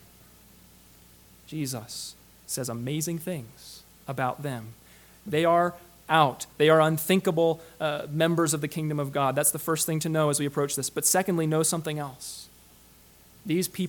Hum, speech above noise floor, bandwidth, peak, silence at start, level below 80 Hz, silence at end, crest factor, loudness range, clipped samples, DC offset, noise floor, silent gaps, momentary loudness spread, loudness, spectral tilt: none; 29 dB; 19 kHz; -4 dBFS; 1.5 s; -62 dBFS; 0 s; 22 dB; 10 LU; under 0.1%; under 0.1%; -55 dBFS; none; 16 LU; -26 LUFS; -4.5 dB/octave